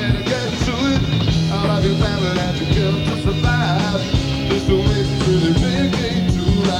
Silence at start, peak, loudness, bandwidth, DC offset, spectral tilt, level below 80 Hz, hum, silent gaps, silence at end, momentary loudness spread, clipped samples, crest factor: 0 s; -4 dBFS; -18 LUFS; 13 kHz; under 0.1%; -6 dB/octave; -28 dBFS; none; none; 0 s; 3 LU; under 0.1%; 14 dB